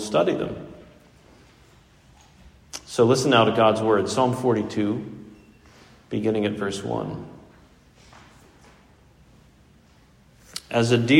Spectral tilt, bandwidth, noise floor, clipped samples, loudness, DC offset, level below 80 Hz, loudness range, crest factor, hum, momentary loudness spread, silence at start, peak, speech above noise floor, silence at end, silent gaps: -5.5 dB/octave; 16 kHz; -55 dBFS; under 0.1%; -22 LUFS; under 0.1%; -58 dBFS; 11 LU; 22 dB; none; 20 LU; 0 s; -2 dBFS; 34 dB; 0 s; none